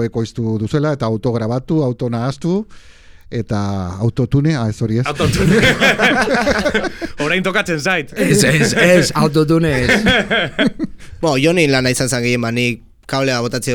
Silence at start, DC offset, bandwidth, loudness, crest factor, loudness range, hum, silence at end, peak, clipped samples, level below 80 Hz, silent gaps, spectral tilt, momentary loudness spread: 0 s; under 0.1%; 19.5 kHz; -15 LUFS; 14 dB; 6 LU; none; 0 s; 0 dBFS; under 0.1%; -38 dBFS; none; -5 dB/octave; 9 LU